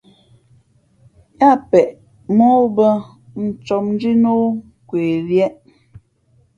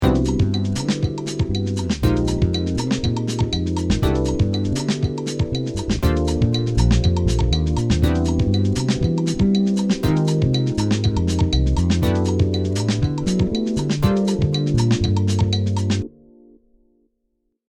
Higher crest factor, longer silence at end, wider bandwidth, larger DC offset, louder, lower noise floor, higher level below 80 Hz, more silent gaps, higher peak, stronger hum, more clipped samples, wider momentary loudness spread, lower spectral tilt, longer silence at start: about the same, 18 dB vs 16 dB; second, 1.05 s vs 1.6 s; second, 7.4 kHz vs 16.5 kHz; neither; first, -16 LUFS vs -20 LUFS; second, -57 dBFS vs -71 dBFS; second, -56 dBFS vs -28 dBFS; neither; first, 0 dBFS vs -4 dBFS; neither; neither; first, 12 LU vs 4 LU; first, -8.5 dB/octave vs -6.5 dB/octave; first, 1.4 s vs 0 s